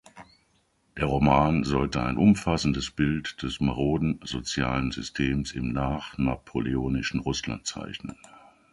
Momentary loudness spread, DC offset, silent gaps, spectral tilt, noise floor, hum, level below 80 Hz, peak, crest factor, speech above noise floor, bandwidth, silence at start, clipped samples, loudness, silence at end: 11 LU; under 0.1%; none; -5.5 dB/octave; -68 dBFS; none; -42 dBFS; -6 dBFS; 20 dB; 42 dB; 11.5 kHz; 0.15 s; under 0.1%; -27 LUFS; 0.6 s